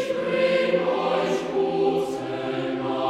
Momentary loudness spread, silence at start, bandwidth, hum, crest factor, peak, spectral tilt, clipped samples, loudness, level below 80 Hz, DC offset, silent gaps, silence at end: 7 LU; 0 s; 12.5 kHz; none; 14 dB; -8 dBFS; -5.5 dB/octave; under 0.1%; -24 LUFS; -62 dBFS; under 0.1%; none; 0 s